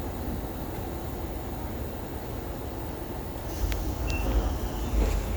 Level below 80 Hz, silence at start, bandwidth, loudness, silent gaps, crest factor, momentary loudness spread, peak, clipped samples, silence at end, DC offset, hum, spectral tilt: -32 dBFS; 0 s; over 20 kHz; -32 LUFS; none; 18 dB; 7 LU; -12 dBFS; under 0.1%; 0 s; under 0.1%; none; -6 dB/octave